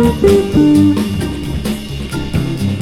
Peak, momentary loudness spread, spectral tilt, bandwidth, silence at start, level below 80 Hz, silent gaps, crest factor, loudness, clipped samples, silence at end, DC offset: 0 dBFS; 11 LU; -7 dB/octave; 16 kHz; 0 s; -28 dBFS; none; 12 dB; -14 LUFS; under 0.1%; 0 s; under 0.1%